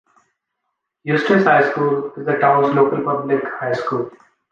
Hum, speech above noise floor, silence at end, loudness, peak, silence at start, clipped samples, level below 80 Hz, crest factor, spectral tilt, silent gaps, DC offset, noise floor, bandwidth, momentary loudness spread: none; 59 dB; 0.35 s; -17 LUFS; -2 dBFS; 1.05 s; under 0.1%; -66 dBFS; 16 dB; -7.5 dB/octave; none; under 0.1%; -76 dBFS; 7.2 kHz; 9 LU